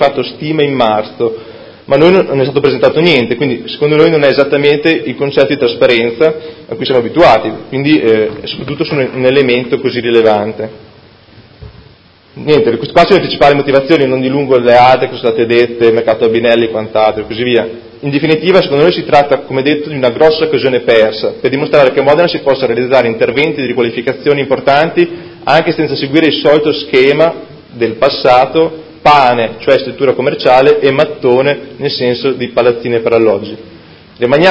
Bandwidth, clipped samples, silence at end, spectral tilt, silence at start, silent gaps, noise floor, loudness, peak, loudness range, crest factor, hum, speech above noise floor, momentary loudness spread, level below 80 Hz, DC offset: 8 kHz; 1%; 0 s; -7 dB/octave; 0 s; none; -42 dBFS; -10 LUFS; 0 dBFS; 3 LU; 10 dB; none; 32 dB; 8 LU; -44 dBFS; under 0.1%